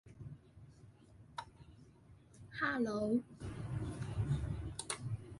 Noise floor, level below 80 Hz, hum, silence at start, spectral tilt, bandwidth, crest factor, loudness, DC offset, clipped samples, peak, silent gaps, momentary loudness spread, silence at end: -62 dBFS; -54 dBFS; none; 0.05 s; -5.5 dB/octave; 11.5 kHz; 20 dB; -40 LUFS; under 0.1%; under 0.1%; -22 dBFS; none; 24 LU; 0 s